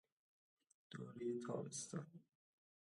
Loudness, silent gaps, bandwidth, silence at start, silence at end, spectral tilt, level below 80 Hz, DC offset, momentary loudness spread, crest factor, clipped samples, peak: -49 LUFS; none; 11.5 kHz; 0.9 s; 0.7 s; -5 dB/octave; under -90 dBFS; under 0.1%; 14 LU; 20 dB; under 0.1%; -32 dBFS